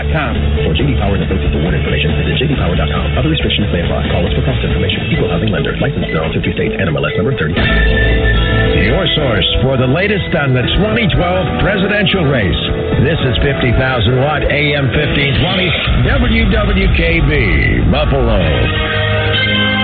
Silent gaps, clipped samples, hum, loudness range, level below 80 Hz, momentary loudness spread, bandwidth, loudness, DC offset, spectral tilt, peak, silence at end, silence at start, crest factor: none; under 0.1%; none; 2 LU; -18 dBFS; 3 LU; 4.6 kHz; -13 LUFS; under 0.1%; -10 dB/octave; 0 dBFS; 0 s; 0 s; 12 dB